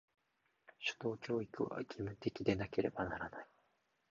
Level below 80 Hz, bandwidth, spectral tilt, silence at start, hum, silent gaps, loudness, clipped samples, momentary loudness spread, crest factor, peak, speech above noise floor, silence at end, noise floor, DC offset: -66 dBFS; 7.2 kHz; -4.5 dB/octave; 0.8 s; none; none; -41 LUFS; under 0.1%; 8 LU; 22 dB; -20 dBFS; 39 dB; 0.65 s; -80 dBFS; under 0.1%